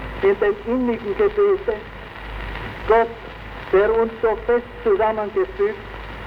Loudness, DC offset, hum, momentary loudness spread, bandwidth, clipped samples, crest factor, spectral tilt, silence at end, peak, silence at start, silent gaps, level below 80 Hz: -20 LUFS; under 0.1%; none; 16 LU; 5.6 kHz; under 0.1%; 16 dB; -7.5 dB/octave; 0 s; -4 dBFS; 0 s; none; -38 dBFS